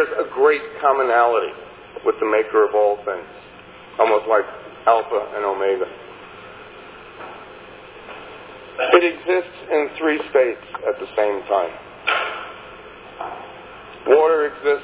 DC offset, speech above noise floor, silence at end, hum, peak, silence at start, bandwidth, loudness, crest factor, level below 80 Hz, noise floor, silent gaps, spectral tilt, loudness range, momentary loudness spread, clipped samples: under 0.1%; 23 dB; 0 s; 60 Hz at -60 dBFS; 0 dBFS; 0 s; 4 kHz; -19 LUFS; 20 dB; -60 dBFS; -42 dBFS; none; -7.5 dB/octave; 5 LU; 22 LU; under 0.1%